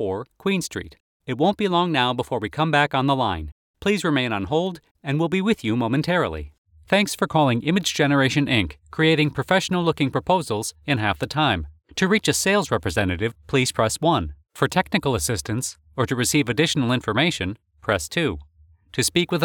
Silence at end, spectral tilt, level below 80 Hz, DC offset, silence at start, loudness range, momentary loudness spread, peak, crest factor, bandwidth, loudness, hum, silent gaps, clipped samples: 0 s; -4.5 dB/octave; -46 dBFS; under 0.1%; 0 s; 3 LU; 9 LU; -4 dBFS; 18 dB; 19 kHz; -22 LUFS; none; 1.00-1.20 s, 3.52-3.74 s, 4.91-4.95 s, 6.58-6.65 s; under 0.1%